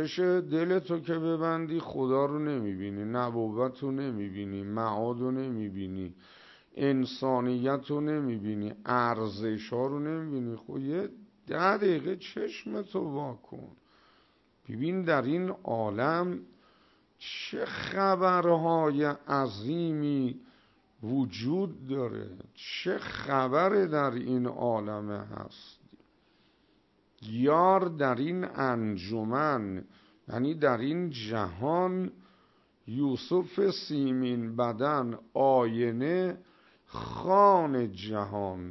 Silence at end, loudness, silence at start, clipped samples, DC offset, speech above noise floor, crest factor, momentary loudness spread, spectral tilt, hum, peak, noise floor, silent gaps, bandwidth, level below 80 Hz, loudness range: 0 s; -30 LUFS; 0 s; under 0.1%; under 0.1%; 38 dB; 20 dB; 13 LU; -8 dB/octave; none; -10 dBFS; -68 dBFS; none; 6.2 kHz; -68 dBFS; 5 LU